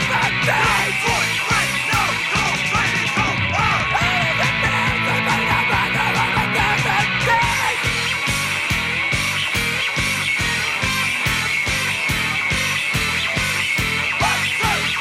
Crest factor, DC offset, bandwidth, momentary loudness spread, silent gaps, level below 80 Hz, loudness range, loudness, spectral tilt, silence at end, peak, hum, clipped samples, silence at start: 14 dB; under 0.1%; 15.5 kHz; 2 LU; none; -38 dBFS; 1 LU; -17 LUFS; -3 dB/octave; 0 s; -6 dBFS; none; under 0.1%; 0 s